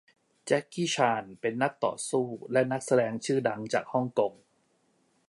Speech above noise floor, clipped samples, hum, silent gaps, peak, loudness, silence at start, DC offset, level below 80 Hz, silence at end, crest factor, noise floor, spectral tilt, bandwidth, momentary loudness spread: 42 dB; under 0.1%; none; none; -10 dBFS; -29 LUFS; 0.45 s; under 0.1%; -76 dBFS; 0.95 s; 20 dB; -70 dBFS; -4.5 dB/octave; 11.5 kHz; 5 LU